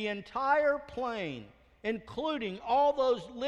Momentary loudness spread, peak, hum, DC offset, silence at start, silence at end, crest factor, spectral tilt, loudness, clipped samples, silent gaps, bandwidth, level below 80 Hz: 11 LU; -16 dBFS; none; under 0.1%; 0 s; 0 s; 16 dB; -5.5 dB/octave; -31 LUFS; under 0.1%; none; 8.8 kHz; -62 dBFS